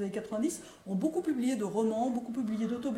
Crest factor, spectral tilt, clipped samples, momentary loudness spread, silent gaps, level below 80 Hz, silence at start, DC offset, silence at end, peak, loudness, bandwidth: 14 dB; -6 dB/octave; under 0.1%; 5 LU; none; -70 dBFS; 0 s; under 0.1%; 0 s; -18 dBFS; -33 LUFS; 15.5 kHz